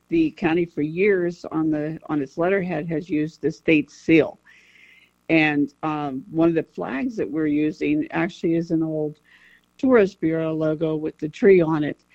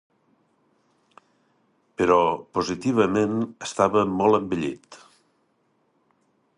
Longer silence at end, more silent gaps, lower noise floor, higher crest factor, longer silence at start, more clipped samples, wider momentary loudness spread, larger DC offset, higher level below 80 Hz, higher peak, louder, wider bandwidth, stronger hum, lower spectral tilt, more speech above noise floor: second, 0.2 s vs 1.6 s; neither; second, -54 dBFS vs -68 dBFS; about the same, 18 dB vs 22 dB; second, 0.1 s vs 2 s; neither; about the same, 9 LU vs 10 LU; neither; about the same, -56 dBFS vs -58 dBFS; about the same, -4 dBFS vs -4 dBFS; about the same, -22 LUFS vs -23 LUFS; second, 7.6 kHz vs 11 kHz; first, 60 Hz at -60 dBFS vs none; first, -7.5 dB/octave vs -6 dB/octave; second, 33 dB vs 46 dB